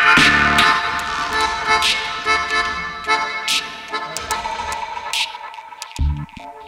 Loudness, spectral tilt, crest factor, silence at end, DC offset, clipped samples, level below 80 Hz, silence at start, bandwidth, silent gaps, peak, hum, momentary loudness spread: -18 LUFS; -2.5 dB/octave; 18 dB; 0 s; under 0.1%; under 0.1%; -34 dBFS; 0 s; 16.5 kHz; none; -2 dBFS; none; 14 LU